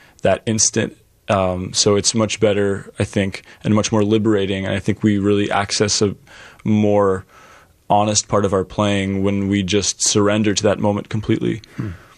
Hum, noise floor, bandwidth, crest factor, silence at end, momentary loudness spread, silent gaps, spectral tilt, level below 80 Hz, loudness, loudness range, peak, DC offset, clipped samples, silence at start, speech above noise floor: none; -47 dBFS; 12 kHz; 16 dB; 0.2 s; 7 LU; none; -4 dB/octave; -48 dBFS; -18 LUFS; 1 LU; -2 dBFS; under 0.1%; under 0.1%; 0.25 s; 30 dB